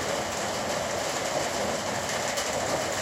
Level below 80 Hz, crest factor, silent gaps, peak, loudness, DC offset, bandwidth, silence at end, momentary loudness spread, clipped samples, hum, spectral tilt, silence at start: -56 dBFS; 14 dB; none; -16 dBFS; -28 LUFS; under 0.1%; 16.5 kHz; 0 s; 1 LU; under 0.1%; none; -2.5 dB/octave; 0 s